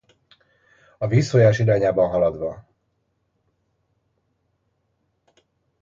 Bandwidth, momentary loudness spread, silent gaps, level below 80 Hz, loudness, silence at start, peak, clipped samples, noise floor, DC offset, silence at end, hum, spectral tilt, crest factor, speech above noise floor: 7.6 kHz; 14 LU; none; -54 dBFS; -20 LUFS; 1 s; -4 dBFS; under 0.1%; -71 dBFS; under 0.1%; 3.2 s; none; -7.5 dB/octave; 20 dB; 53 dB